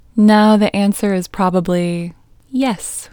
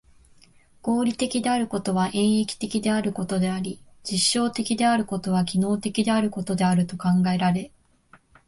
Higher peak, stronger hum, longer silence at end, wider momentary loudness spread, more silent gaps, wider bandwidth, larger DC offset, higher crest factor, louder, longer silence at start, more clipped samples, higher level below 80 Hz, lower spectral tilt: first, 0 dBFS vs -8 dBFS; neither; second, 0.05 s vs 0.8 s; first, 13 LU vs 6 LU; neither; first, 19 kHz vs 11.5 kHz; neither; about the same, 14 dB vs 16 dB; first, -15 LUFS vs -24 LUFS; second, 0.15 s vs 0.85 s; neither; first, -46 dBFS vs -56 dBFS; about the same, -6 dB/octave vs -5 dB/octave